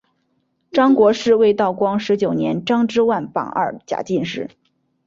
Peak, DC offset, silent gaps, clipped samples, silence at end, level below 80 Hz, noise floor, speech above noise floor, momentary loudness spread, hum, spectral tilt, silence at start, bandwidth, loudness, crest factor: -4 dBFS; under 0.1%; none; under 0.1%; 0.6 s; -60 dBFS; -67 dBFS; 50 dB; 9 LU; none; -6 dB/octave; 0.75 s; 7.6 kHz; -18 LUFS; 14 dB